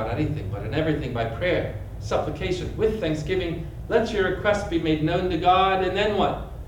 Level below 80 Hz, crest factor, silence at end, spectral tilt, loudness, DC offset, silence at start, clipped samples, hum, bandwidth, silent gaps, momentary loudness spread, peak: -38 dBFS; 16 dB; 0 s; -6.5 dB/octave; -24 LUFS; under 0.1%; 0 s; under 0.1%; none; 18 kHz; none; 8 LU; -8 dBFS